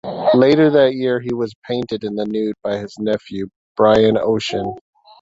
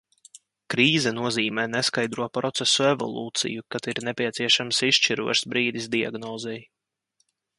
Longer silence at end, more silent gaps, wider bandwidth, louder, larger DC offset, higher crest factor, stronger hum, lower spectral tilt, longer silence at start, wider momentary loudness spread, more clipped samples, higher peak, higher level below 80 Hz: second, 0.4 s vs 0.95 s; first, 1.55-1.62 s, 3.56-3.75 s vs none; second, 7.8 kHz vs 11.5 kHz; first, -17 LUFS vs -23 LUFS; neither; about the same, 16 dB vs 20 dB; neither; first, -6.5 dB/octave vs -3 dB/octave; second, 0.05 s vs 0.7 s; about the same, 13 LU vs 11 LU; neither; first, -2 dBFS vs -6 dBFS; first, -52 dBFS vs -68 dBFS